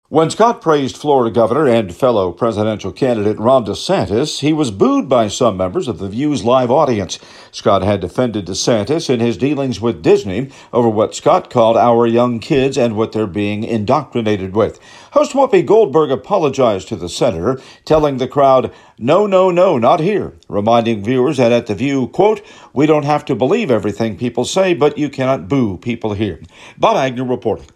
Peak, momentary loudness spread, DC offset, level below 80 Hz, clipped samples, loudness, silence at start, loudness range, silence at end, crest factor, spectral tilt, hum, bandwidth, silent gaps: 0 dBFS; 8 LU; under 0.1%; -48 dBFS; under 0.1%; -15 LUFS; 0.1 s; 3 LU; 0.1 s; 14 dB; -6 dB/octave; none; 12.5 kHz; none